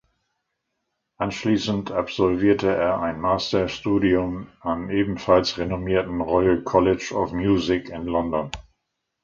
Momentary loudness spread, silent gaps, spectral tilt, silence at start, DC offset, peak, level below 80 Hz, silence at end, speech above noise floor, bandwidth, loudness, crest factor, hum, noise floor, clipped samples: 9 LU; none; -6 dB/octave; 1.2 s; under 0.1%; -4 dBFS; -44 dBFS; 0.65 s; 56 dB; 7.6 kHz; -22 LUFS; 18 dB; none; -78 dBFS; under 0.1%